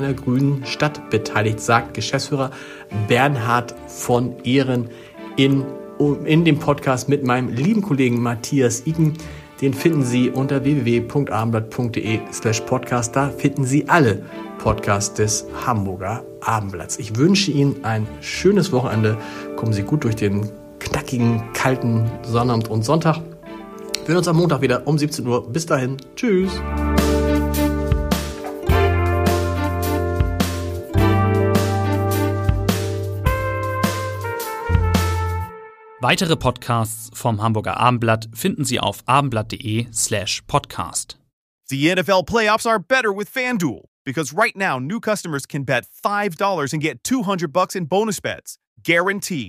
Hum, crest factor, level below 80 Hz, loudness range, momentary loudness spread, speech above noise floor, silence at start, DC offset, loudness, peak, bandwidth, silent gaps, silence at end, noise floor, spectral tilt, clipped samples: none; 20 dB; -34 dBFS; 2 LU; 9 LU; 21 dB; 0 s; under 0.1%; -20 LUFS; 0 dBFS; 15.5 kHz; 41.33-41.59 s, 43.88-44.05 s, 48.67-48.76 s; 0 s; -40 dBFS; -5.5 dB/octave; under 0.1%